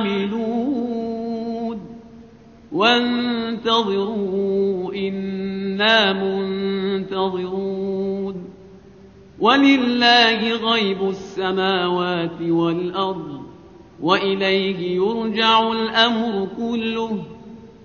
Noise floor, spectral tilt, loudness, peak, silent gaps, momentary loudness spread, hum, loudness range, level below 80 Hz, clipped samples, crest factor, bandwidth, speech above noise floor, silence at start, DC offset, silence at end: -45 dBFS; -2.5 dB/octave; -20 LUFS; 0 dBFS; none; 12 LU; none; 5 LU; -56 dBFS; under 0.1%; 20 dB; 7 kHz; 26 dB; 0 s; under 0.1%; 0 s